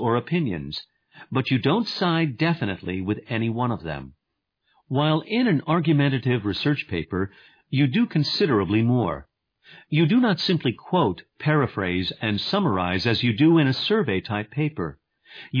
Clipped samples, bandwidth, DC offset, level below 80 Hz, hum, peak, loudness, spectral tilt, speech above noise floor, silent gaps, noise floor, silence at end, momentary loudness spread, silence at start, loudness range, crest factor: under 0.1%; 5.2 kHz; under 0.1%; -54 dBFS; none; -6 dBFS; -23 LUFS; -7.5 dB/octave; 57 dB; none; -80 dBFS; 0 s; 9 LU; 0 s; 3 LU; 16 dB